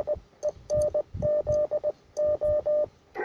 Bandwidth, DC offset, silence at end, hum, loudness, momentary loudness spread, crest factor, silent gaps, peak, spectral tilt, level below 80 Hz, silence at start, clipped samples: 10 kHz; under 0.1%; 0 s; none; -28 LUFS; 8 LU; 12 dB; none; -16 dBFS; -6.5 dB/octave; -48 dBFS; 0 s; under 0.1%